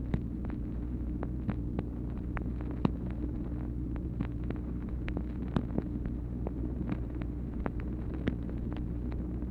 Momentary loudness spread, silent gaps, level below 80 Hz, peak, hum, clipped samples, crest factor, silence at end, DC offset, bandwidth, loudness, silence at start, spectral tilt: 4 LU; none; -38 dBFS; -12 dBFS; none; under 0.1%; 22 dB; 0 s; under 0.1%; 4.4 kHz; -37 LUFS; 0 s; -10 dB/octave